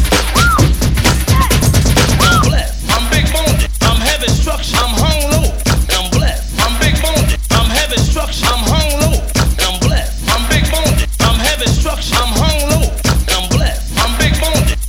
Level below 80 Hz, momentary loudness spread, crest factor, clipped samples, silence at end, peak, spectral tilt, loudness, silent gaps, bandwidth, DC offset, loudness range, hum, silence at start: -16 dBFS; 4 LU; 12 dB; under 0.1%; 0 s; 0 dBFS; -4 dB/octave; -13 LUFS; none; 16.5 kHz; 0.2%; 2 LU; none; 0 s